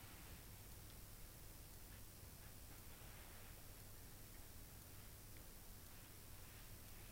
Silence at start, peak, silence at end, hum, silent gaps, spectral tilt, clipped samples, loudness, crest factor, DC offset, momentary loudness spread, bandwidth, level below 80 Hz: 0 s; -44 dBFS; 0 s; none; none; -3.5 dB/octave; under 0.1%; -59 LUFS; 14 dB; under 0.1%; 1 LU; over 20 kHz; -62 dBFS